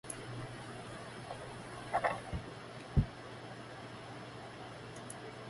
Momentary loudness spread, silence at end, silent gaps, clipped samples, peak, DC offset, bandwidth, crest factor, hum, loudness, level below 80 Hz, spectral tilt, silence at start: 12 LU; 0 s; none; under 0.1%; -16 dBFS; under 0.1%; 11.5 kHz; 26 dB; none; -42 LUFS; -50 dBFS; -5.5 dB/octave; 0.05 s